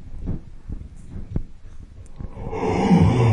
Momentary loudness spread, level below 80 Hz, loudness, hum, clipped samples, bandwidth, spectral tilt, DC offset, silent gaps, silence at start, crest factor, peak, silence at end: 23 LU; -34 dBFS; -22 LUFS; none; under 0.1%; 9.6 kHz; -8 dB/octave; under 0.1%; none; 0 s; 18 dB; -4 dBFS; 0 s